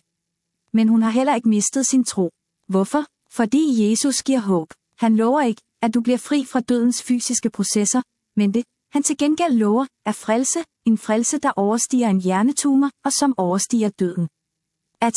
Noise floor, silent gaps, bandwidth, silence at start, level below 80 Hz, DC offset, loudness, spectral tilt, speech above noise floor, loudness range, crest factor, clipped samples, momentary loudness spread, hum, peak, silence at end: -78 dBFS; none; 12 kHz; 0.75 s; -68 dBFS; under 0.1%; -20 LUFS; -4.5 dB/octave; 59 dB; 1 LU; 14 dB; under 0.1%; 6 LU; none; -6 dBFS; 0 s